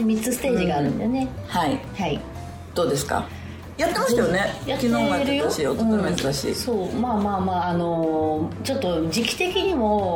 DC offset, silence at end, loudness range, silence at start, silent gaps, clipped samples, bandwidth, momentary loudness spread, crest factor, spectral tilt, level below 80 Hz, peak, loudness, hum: under 0.1%; 0 s; 3 LU; 0 s; none; under 0.1%; 19.5 kHz; 6 LU; 16 dB; -5 dB/octave; -44 dBFS; -6 dBFS; -23 LUFS; none